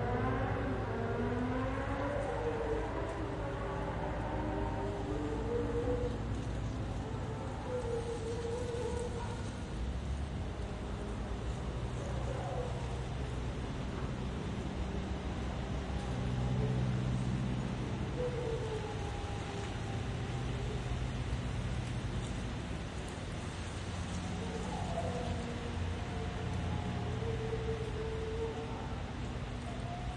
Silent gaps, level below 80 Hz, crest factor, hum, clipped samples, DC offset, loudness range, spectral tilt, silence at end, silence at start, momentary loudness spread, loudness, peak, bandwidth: none; -44 dBFS; 16 dB; none; under 0.1%; under 0.1%; 3 LU; -6.5 dB/octave; 0 s; 0 s; 5 LU; -38 LUFS; -22 dBFS; 11 kHz